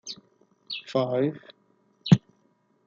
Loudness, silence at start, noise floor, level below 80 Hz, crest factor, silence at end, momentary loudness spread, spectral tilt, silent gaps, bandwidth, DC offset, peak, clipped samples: -26 LUFS; 0.05 s; -67 dBFS; -58 dBFS; 26 dB; 0.7 s; 19 LU; -6.5 dB/octave; none; 7.4 kHz; under 0.1%; -2 dBFS; under 0.1%